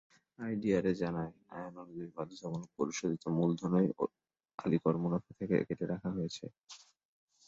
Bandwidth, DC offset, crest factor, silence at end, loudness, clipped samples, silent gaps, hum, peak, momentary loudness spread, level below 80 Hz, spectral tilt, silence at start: 7.8 kHz; under 0.1%; 20 dB; 0.7 s; -35 LUFS; under 0.1%; 4.54-4.58 s; none; -16 dBFS; 15 LU; -66 dBFS; -7 dB/octave; 0.4 s